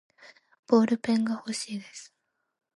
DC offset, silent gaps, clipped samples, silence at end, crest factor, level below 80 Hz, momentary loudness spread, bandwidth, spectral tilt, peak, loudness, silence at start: under 0.1%; none; under 0.1%; 0.7 s; 22 dB; -76 dBFS; 19 LU; 11.5 kHz; -5 dB/octave; -8 dBFS; -27 LUFS; 0.7 s